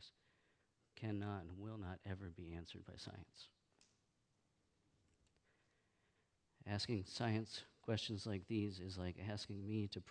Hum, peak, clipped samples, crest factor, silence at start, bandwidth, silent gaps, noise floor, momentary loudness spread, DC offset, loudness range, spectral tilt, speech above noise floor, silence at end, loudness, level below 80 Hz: none; -28 dBFS; under 0.1%; 22 dB; 0 s; 10 kHz; none; -83 dBFS; 15 LU; under 0.1%; 15 LU; -6 dB/octave; 37 dB; 0 s; -47 LUFS; -72 dBFS